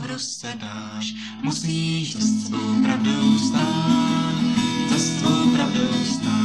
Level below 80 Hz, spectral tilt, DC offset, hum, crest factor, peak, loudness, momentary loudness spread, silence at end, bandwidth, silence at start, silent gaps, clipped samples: -56 dBFS; -4.5 dB/octave; 0.1%; none; 14 dB; -6 dBFS; -21 LUFS; 11 LU; 0 s; 12 kHz; 0 s; none; under 0.1%